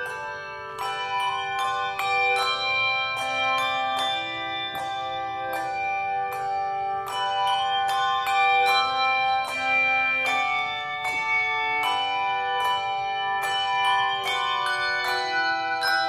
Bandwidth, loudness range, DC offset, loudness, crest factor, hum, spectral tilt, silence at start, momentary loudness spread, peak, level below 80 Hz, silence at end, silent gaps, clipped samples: 15.5 kHz; 5 LU; under 0.1%; -24 LUFS; 14 dB; none; -1 dB/octave; 0 s; 8 LU; -10 dBFS; -62 dBFS; 0 s; none; under 0.1%